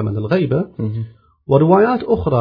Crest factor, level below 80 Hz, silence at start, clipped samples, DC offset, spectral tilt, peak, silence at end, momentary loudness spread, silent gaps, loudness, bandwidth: 16 dB; -42 dBFS; 0 s; under 0.1%; under 0.1%; -11 dB/octave; 0 dBFS; 0 s; 12 LU; none; -16 LUFS; 5.4 kHz